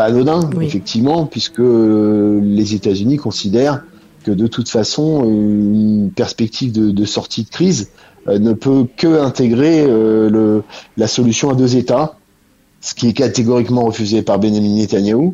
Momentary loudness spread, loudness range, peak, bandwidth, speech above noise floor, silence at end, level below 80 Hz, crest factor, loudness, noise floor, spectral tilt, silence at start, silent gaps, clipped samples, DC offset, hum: 7 LU; 3 LU; -2 dBFS; 8 kHz; 40 dB; 0 s; -48 dBFS; 12 dB; -14 LUFS; -53 dBFS; -6 dB/octave; 0 s; none; under 0.1%; under 0.1%; none